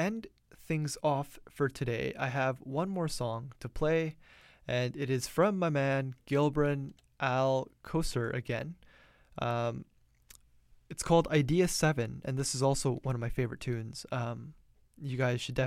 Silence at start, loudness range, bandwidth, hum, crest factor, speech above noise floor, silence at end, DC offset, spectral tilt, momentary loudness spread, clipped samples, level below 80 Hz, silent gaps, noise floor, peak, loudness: 0 s; 4 LU; 16 kHz; none; 18 dB; 31 dB; 0 s; under 0.1%; -5.5 dB/octave; 11 LU; under 0.1%; -52 dBFS; none; -62 dBFS; -14 dBFS; -32 LUFS